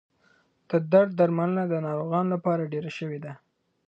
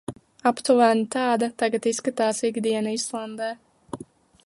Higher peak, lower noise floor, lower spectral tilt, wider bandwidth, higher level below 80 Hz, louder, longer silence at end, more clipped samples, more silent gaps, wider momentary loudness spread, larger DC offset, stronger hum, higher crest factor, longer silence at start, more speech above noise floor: about the same, -6 dBFS vs -6 dBFS; first, -65 dBFS vs -45 dBFS; first, -9 dB/octave vs -3.5 dB/octave; second, 7.6 kHz vs 11.5 kHz; second, -74 dBFS vs -68 dBFS; about the same, -26 LUFS vs -24 LUFS; about the same, 0.5 s vs 0.45 s; neither; neither; second, 13 LU vs 20 LU; neither; neither; about the same, 20 dB vs 20 dB; first, 0.7 s vs 0.1 s; first, 40 dB vs 23 dB